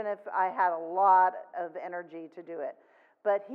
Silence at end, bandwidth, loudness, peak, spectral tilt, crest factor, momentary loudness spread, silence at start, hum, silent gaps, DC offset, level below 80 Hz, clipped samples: 0 s; 4.7 kHz; -29 LUFS; -12 dBFS; -7.5 dB/octave; 18 dB; 18 LU; 0 s; none; none; under 0.1%; under -90 dBFS; under 0.1%